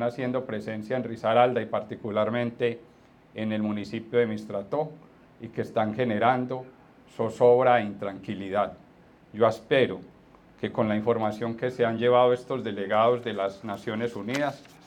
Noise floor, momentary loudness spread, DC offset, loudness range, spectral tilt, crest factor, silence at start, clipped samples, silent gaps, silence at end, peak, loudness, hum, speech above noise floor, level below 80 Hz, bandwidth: -55 dBFS; 13 LU; under 0.1%; 4 LU; -7 dB/octave; 20 dB; 0 s; under 0.1%; none; 0.25 s; -6 dBFS; -27 LUFS; none; 29 dB; -68 dBFS; 10 kHz